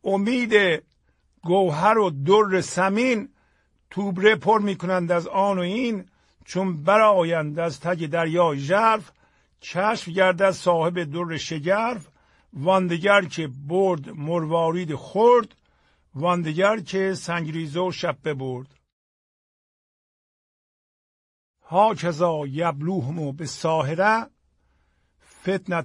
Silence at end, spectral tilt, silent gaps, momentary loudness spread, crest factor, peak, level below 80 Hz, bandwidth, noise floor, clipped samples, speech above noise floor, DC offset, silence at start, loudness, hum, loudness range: 0 s; -5.5 dB/octave; 18.93-21.54 s; 11 LU; 20 dB; -2 dBFS; -64 dBFS; 11.5 kHz; -66 dBFS; under 0.1%; 44 dB; under 0.1%; 0.05 s; -22 LUFS; none; 7 LU